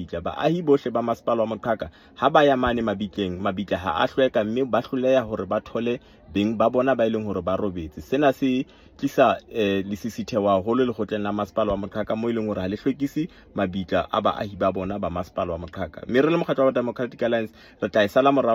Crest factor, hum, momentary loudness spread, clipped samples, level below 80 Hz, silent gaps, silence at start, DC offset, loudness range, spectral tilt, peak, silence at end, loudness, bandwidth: 20 dB; none; 9 LU; under 0.1%; -52 dBFS; none; 0 s; under 0.1%; 3 LU; -6.5 dB/octave; -4 dBFS; 0 s; -24 LUFS; 15.5 kHz